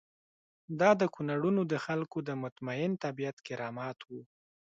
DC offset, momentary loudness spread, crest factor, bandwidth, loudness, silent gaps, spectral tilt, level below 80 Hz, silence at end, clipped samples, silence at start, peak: under 0.1%; 15 LU; 20 dB; 7.8 kHz; -33 LUFS; 2.52-2.56 s, 3.33-3.37 s; -7 dB/octave; -76 dBFS; 0.45 s; under 0.1%; 0.7 s; -12 dBFS